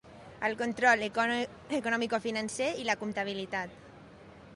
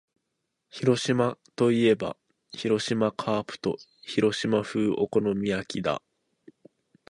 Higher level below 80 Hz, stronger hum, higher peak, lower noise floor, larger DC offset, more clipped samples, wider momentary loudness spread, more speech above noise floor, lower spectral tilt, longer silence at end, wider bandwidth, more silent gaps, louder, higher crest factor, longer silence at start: about the same, -66 dBFS vs -62 dBFS; neither; second, -12 dBFS vs -8 dBFS; second, -52 dBFS vs -81 dBFS; neither; neither; about the same, 10 LU vs 11 LU; second, 21 dB vs 55 dB; second, -3.5 dB/octave vs -5.5 dB/octave; second, 0 s vs 1.15 s; about the same, 11.5 kHz vs 11.5 kHz; neither; second, -31 LUFS vs -27 LUFS; about the same, 20 dB vs 18 dB; second, 0.05 s vs 0.75 s